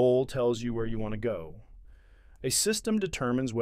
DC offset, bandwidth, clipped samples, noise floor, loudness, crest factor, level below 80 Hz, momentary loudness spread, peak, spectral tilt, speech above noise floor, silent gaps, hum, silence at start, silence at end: under 0.1%; 16 kHz; under 0.1%; -54 dBFS; -29 LUFS; 16 dB; -46 dBFS; 10 LU; -12 dBFS; -4.5 dB/octave; 26 dB; none; none; 0 s; 0 s